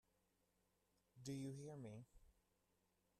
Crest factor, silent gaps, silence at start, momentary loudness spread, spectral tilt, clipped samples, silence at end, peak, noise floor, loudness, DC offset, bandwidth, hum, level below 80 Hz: 18 dB; none; 1.15 s; 8 LU; -6 dB/octave; under 0.1%; 0.9 s; -40 dBFS; -85 dBFS; -54 LUFS; under 0.1%; 14 kHz; none; -80 dBFS